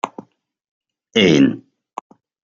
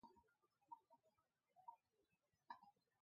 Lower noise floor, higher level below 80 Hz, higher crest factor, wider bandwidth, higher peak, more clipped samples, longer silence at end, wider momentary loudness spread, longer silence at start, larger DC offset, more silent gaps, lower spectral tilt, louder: second, -41 dBFS vs -89 dBFS; first, -60 dBFS vs under -90 dBFS; second, 18 dB vs 26 dB; first, 7.6 kHz vs 5.2 kHz; first, -2 dBFS vs -42 dBFS; neither; first, 0.9 s vs 0.3 s; first, 23 LU vs 3 LU; about the same, 0.05 s vs 0.05 s; neither; first, 0.68-0.81 s vs none; first, -5.5 dB/octave vs -2 dB/octave; first, -15 LUFS vs -66 LUFS